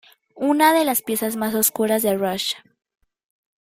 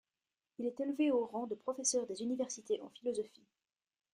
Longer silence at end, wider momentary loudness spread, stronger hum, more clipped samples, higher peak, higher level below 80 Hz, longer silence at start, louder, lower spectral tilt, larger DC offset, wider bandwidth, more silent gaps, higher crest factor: first, 1.05 s vs 0.85 s; about the same, 10 LU vs 9 LU; neither; neither; first, -2 dBFS vs -20 dBFS; first, -66 dBFS vs -84 dBFS; second, 0.35 s vs 0.6 s; first, -20 LUFS vs -37 LUFS; about the same, -3 dB/octave vs -3 dB/octave; neither; first, 16 kHz vs 12 kHz; neither; about the same, 20 dB vs 20 dB